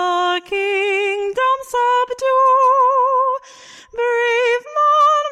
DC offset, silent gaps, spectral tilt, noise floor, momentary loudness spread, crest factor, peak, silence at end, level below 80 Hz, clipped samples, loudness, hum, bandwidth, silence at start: under 0.1%; none; -1 dB/octave; -42 dBFS; 7 LU; 10 dB; -6 dBFS; 0 s; -60 dBFS; under 0.1%; -16 LUFS; none; 13 kHz; 0 s